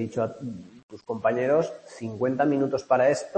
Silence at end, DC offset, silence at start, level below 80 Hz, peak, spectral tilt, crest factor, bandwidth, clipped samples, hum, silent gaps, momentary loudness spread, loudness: 0 s; under 0.1%; 0 s; -68 dBFS; -8 dBFS; -6.5 dB/octave; 18 dB; 8.8 kHz; under 0.1%; none; 0.83-0.89 s; 16 LU; -25 LUFS